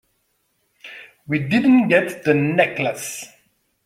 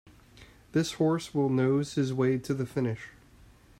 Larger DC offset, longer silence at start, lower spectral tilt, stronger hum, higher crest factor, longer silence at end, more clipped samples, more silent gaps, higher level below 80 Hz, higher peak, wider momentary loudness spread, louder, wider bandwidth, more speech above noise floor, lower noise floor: neither; first, 0.85 s vs 0.4 s; about the same, -5.5 dB/octave vs -6.5 dB/octave; neither; about the same, 18 dB vs 16 dB; about the same, 0.6 s vs 0.7 s; neither; neither; about the same, -60 dBFS vs -60 dBFS; first, -2 dBFS vs -14 dBFS; first, 23 LU vs 6 LU; first, -18 LUFS vs -29 LUFS; about the same, 15.5 kHz vs 15 kHz; first, 50 dB vs 28 dB; first, -68 dBFS vs -56 dBFS